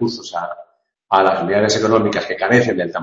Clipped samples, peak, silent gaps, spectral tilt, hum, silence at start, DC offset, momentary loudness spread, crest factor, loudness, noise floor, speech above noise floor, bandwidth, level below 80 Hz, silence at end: under 0.1%; 0 dBFS; none; -5 dB/octave; none; 0 s; under 0.1%; 11 LU; 18 dB; -16 LUFS; -50 dBFS; 34 dB; 8.2 kHz; -56 dBFS; 0 s